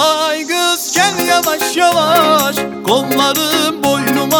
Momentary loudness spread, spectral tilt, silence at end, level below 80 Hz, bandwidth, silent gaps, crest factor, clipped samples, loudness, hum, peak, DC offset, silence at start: 5 LU; -2.5 dB/octave; 0 s; -56 dBFS; over 20 kHz; none; 14 dB; under 0.1%; -13 LUFS; none; 0 dBFS; under 0.1%; 0 s